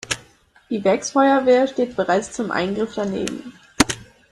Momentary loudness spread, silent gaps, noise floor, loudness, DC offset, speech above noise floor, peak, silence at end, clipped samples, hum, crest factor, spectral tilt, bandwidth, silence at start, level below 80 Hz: 13 LU; none; -53 dBFS; -20 LUFS; under 0.1%; 33 dB; 0 dBFS; 0.3 s; under 0.1%; none; 20 dB; -4 dB/octave; 13.5 kHz; 0.05 s; -48 dBFS